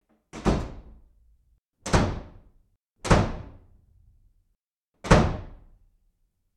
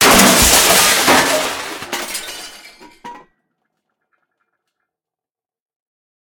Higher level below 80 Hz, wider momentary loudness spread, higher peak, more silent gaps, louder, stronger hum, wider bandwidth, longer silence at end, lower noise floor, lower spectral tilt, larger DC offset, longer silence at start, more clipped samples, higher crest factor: about the same, -36 dBFS vs -36 dBFS; about the same, 20 LU vs 20 LU; about the same, -2 dBFS vs 0 dBFS; first, 2.76-2.85 s, 4.64-4.69 s, 4.84-4.92 s vs none; second, -25 LUFS vs -11 LUFS; neither; second, 12.5 kHz vs over 20 kHz; second, 1 s vs 3 s; second, -76 dBFS vs -90 dBFS; first, -6 dB/octave vs -1.5 dB/octave; neither; first, 0.35 s vs 0 s; neither; first, 26 dB vs 16 dB